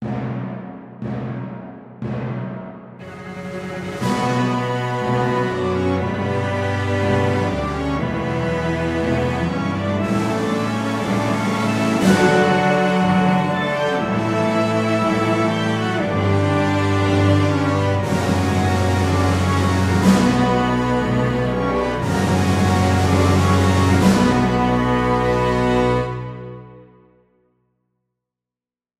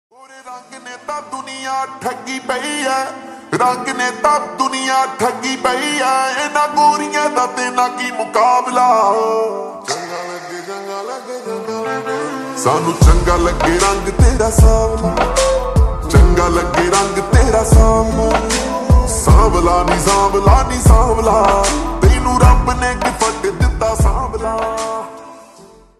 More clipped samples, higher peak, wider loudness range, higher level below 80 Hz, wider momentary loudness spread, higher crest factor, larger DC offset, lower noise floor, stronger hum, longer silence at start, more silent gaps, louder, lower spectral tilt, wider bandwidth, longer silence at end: neither; about the same, -2 dBFS vs 0 dBFS; about the same, 7 LU vs 7 LU; second, -40 dBFS vs -18 dBFS; about the same, 13 LU vs 14 LU; about the same, 16 dB vs 14 dB; neither; first, under -90 dBFS vs -42 dBFS; neither; second, 0 s vs 0.35 s; neither; second, -19 LUFS vs -14 LUFS; first, -6.5 dB/octave vs -5 dB/octave; first, 14.5 kHz vs 13 kHz; first, 2.15 s vs 0.55 s